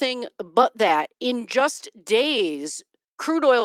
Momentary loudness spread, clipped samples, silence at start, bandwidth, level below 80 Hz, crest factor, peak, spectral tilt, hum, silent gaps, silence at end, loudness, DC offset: 12 LU; under 0.1%; 0 s; 16 kHz; -78 dBFS; 20 dB; -4 dBFS; -2.5 dB/octave; none; 3.08-3.18 s; 0 s; -22 LUFS; under 0.1%